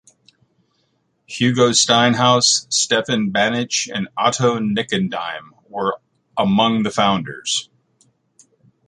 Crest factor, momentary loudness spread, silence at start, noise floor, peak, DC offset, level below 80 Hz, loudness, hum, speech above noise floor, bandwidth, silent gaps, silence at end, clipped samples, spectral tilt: 18 dB; 12 LU; 1.3 s; -66 dBFS; -2 dBFS; under 0.1%; -58 dBFS; -17 LUFS; none; 48 dB; 11.5 kHz; none; 1.25 s; under 0.1%; -3 dB/octave